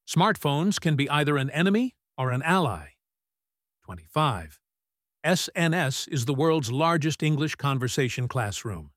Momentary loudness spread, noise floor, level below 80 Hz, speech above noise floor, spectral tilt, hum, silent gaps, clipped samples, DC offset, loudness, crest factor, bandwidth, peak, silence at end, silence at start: 8 LU; under -90 dBFS; -56 dBFS; over 65 dB; -5 dB/octave; none; none; under 0.1%; under 0.1%; -25 LUFS; 18 dB; 16 kHz; -8 dBFS; 0.1 s; 0.1 s